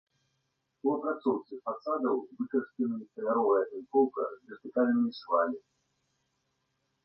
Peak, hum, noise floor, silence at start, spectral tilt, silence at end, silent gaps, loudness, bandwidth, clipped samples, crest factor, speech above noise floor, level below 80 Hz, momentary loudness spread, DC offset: -14 dBFS; 50 Hz at -75 dBFS; -79 dBFS; 0.85 s; -8.5 dB/octave; 1.45 s; none; -31 LUFS; 5.8 kHz; under 0.1%; 18 dB; 49 dB; -82 dBFS; 9 LU; under 0.1%